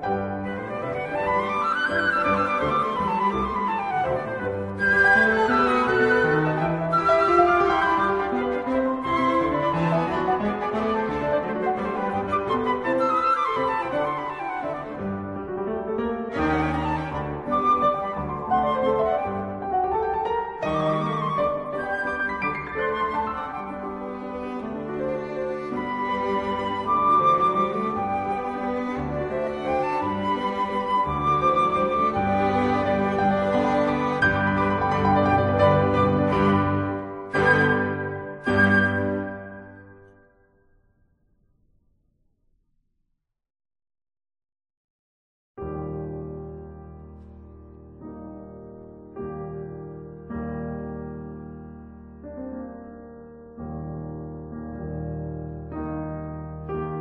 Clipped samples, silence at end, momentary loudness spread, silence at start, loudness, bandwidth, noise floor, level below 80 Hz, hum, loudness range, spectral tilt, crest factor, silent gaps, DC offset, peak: under 0.1%; 0 s; 17 LU; 0 s; -24 LUFS; 10.5 kHz; -75 dBFS; -46 dBFS; none; 17 LU; -7.5 dB/octave; 20 dB; 44.77-45.55 s; under 0.1%; -6 dBFS